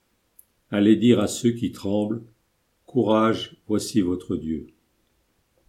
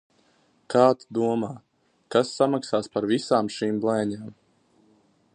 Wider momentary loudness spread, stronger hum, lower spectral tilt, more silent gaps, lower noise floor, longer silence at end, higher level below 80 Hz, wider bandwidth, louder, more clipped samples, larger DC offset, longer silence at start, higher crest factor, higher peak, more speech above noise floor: about the same, 11 LU vs 12 LU; neither; about the same, -6 dB/octave vs -5.5 dB/octave; neither; first, -69 dBFS vs -64 dBFS; about the same, 1 s vs 1.05 s; first, -56 dBFS vs -68 dBFS; first, 15 kHz vs 10 kHz; about the same, -23 LUFS vs -24 LUFS; neither; neither; about the same, 0.7 s vs 0.7 s; about the same, 20 dB vs 22 dB; about the same, -4 dBFS vs -4 dBFS; first, 47 dB vs 40 dB